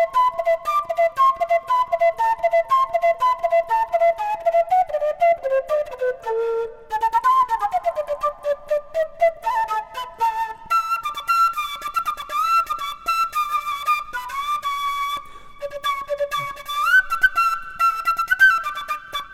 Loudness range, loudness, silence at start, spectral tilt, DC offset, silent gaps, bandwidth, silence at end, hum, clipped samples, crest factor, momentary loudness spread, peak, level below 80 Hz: 4 LU; -21 LUFS; 0 s; -1 dB/octave; under 0.1%; none; 16.5 kHz; 0 s; none; under 0.1%; 16 dB; 9 LU; -4 dBFS; -52 dBFS